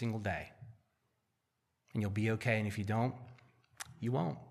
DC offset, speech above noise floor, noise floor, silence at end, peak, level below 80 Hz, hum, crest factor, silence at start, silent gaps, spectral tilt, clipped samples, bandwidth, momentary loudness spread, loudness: under 0.1%; 48 dB; -83 dBFS; 0 s; -18 dBFS; -68 dBFS; none; 20 dB; 0 s; none; -7 dB/octave; under 0.1%; 14.5 kHz; 18 LU; -37 LUFS